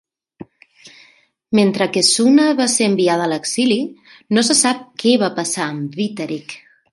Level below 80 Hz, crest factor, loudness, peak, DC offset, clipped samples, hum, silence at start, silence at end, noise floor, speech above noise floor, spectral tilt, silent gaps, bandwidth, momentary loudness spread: -64 dBFS; 16 dB; -16 LUFS; 0 dBFS; under 0.1%; under 0.1%; none; 0.4 s; 0.35 s; -53 dBFS; 37 dB; -3.5 dB/octave; none; 11.5 kHz; 13 LU